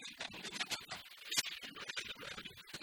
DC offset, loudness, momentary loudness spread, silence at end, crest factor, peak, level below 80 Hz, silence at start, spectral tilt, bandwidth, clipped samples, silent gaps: under 0.1%; -42 LUFS; 11 LU; 0 s; 26 dB; -20 dBFS; -74 dBFS; 0 s; 0 dB/octave; 19 kHz; under 0.1%; none